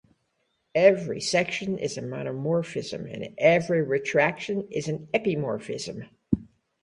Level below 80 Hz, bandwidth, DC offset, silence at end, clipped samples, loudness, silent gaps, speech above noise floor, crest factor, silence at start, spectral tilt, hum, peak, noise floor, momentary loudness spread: -58 dBFS; 11 kHz; under 0.1%; 0.35 s; under 0.1%; -26 LUFS; none; 48 dB; 22 dB; 0.75 s; -5 dB/octave; none; -4 dBFS; -74 dBFS; 13 LU